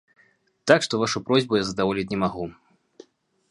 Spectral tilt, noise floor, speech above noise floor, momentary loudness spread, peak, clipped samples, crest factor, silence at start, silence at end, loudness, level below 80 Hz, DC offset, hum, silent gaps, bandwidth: -4.5 dB/octave; -63 dBFS; 40 dB; 12 LU; 0 dBFS; under 0.1%; 24 dB; 0.65 s; 1 s; -23 LUFS; -56 dBFS; under 0.1%; none; none; 11.5 kHz